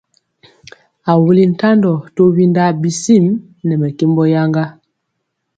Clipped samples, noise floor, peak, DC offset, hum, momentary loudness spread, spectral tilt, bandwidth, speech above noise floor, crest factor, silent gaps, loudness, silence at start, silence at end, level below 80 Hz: under 0.1%; -72 dBFS; 0 dBFS; under 0.1%; none; 8 LU; -7 dB/octave; 9.2 kHz; 60 dB; 14 dB; none; -13 LUFS; 1.05 s; 0.85 s; -56 dBFS